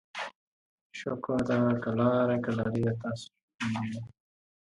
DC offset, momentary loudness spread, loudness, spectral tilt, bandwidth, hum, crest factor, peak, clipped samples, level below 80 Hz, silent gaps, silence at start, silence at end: under 0.1%; 15 LU; -30 LUFS; -7.5 dB/octave; 11 kHz; none; 18 dB; -14 dBFS; under 0.1%; -62 dBFS; 0.35-0.90 s, 3.43-3.48 s, 3.55-3.59 s; 0.15 s; 0.7 s